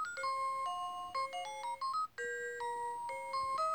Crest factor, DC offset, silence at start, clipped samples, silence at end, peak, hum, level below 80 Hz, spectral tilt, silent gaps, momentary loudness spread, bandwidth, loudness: 12 dB; under 0.1%; 0 s; under 0.1%; 0 s; -26 dBFS; none; -76 dBFS; -0.5 dB/octave; none; 4 LU; over 20 kHz; -39 LUFS